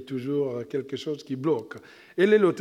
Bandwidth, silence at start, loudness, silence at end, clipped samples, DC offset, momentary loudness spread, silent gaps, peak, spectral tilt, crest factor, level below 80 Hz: 11 kHz; 0 s; -26 LUFS; 0 s; under 0.1%; under 0.1%; 16 LU; none; -8 dBFS; -7 dB/octave; 18 dB; -74 dBFS